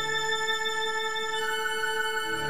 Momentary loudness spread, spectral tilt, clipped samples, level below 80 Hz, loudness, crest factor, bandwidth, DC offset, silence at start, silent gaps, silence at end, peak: 2 LU; -0.5 dB/octave; under 0.1%; -64 dBFS; -28 LUFS; 12 dB; 15.5 kHz; 1%; 0 s; none; 0 s; -16 dBFS